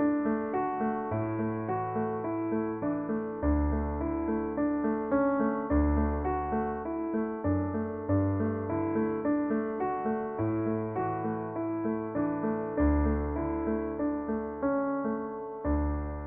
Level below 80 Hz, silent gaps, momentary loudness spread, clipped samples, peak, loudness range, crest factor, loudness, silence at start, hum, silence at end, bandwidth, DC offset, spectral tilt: -40 dBFS; none; 5 LU; under 0.1%; -14 dBFS; 2 LU; 14 dB; -31 LUFS; 0 s; none; 0 s; 3.1 kHz; under 0.1%; -10.5 dB/octave